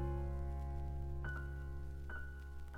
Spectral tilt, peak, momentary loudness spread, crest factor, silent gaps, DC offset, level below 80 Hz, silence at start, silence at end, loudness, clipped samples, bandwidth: -8 dB/octave; -30 dBFS; 6 LU; 12 dB; none; under 0.1%; -44 dBFS; 0 s; 0 s; -46 LUFS; under 0.1%; 5.4 kHz